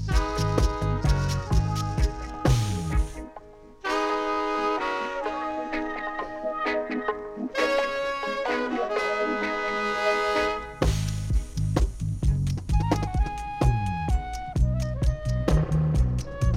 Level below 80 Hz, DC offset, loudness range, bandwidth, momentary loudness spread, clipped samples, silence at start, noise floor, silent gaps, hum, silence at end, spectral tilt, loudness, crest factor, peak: -30 dBFS; under 0.1%; 2 LU; 13.5 kHz; 6 LU; under 0.1%; 0 s; -46 dBFS; none; none; 0 s; -6 dB/octave; -27 LUFS; 18 dB; -8 dBFS